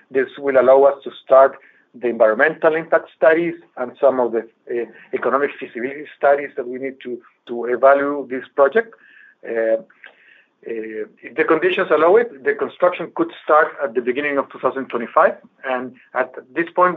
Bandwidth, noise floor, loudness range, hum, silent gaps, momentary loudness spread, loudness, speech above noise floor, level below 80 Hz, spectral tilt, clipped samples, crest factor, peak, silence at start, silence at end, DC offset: 4.2 kHz; -53 dBFS; 6 LU; none; none; 15 LU; -18 LUFS; 34 dB; -78 dBFS; -3 dB/octave; under 0.1%; 18 dB; 0 dBFS; 0.1 s; 0 s; under 0.1%